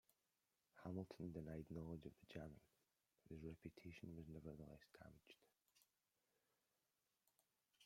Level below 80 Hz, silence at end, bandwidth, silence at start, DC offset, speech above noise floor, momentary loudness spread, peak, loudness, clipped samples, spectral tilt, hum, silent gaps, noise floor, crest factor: -76 dBFS; 0 s; 16 kHz; 0.75 s; under 0.1%; over 34 dB; 11 LU; -36 dBFS; -57 LUFS; under 0.1%; -7.5 dB/octave; none; none; under -90 dBFS; 22 dB